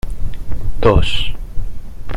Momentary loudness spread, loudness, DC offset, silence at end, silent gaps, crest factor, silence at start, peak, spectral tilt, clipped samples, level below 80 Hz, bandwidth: 18 LU; -18 LUFS; under 0.1%; 0 s; none; 12 dB; 0.05 s; 0 dBFS; -6 dB/octave; under 0.1%; -22 dBFS; 10 kHz